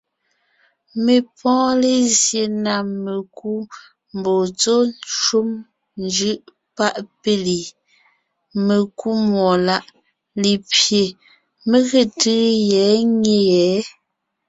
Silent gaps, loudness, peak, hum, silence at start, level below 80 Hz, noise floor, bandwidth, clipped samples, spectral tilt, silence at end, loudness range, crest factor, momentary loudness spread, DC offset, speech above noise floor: none; -18 LUFS; -2 dBFS; none; 0.95 s; -60 dBFS; -75 dBFS; 8.4 kHz; under 0.1%; -3.5 dB/octave; 0.6 s; 5 LU; 18 dB; 13 LU; under 0.1%; 57 dB